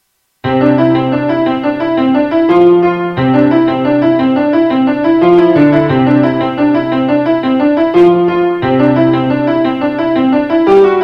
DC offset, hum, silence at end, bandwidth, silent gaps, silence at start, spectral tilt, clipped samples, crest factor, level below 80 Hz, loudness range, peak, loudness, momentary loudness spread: under 0.1%; none; 0 s; 5.6 kHz; none; 0.45 s; -9 dB/octave; 0.1%; 10 dB; -46 dBFS; 1 LU; 0 dBFS; -10 LUFS; 5 LU